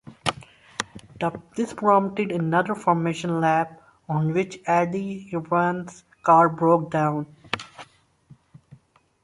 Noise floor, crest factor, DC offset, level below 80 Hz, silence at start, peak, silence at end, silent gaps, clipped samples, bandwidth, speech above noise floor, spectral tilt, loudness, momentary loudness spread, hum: -54 dBFS; 20 dB; under 0.1%; -62 dBFS; 0.05 s; -4 dBFS; 0.5 s; none; under 0.1%; 11.5 kHz; 32 dB; -6.5 dB/octave; -23 LUFS; 14 LU; none